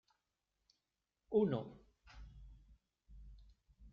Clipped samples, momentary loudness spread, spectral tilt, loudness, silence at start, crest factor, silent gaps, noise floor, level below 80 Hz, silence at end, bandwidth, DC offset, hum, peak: under 0.1%; 27 LU; -8 dB/octave; -38 LUFS; 1.3 s; 22 dB; none; -90 dBFS; -62 dBFS; 0.05 s; 6.4 kHz; under 0.1%; none; -22 dBFS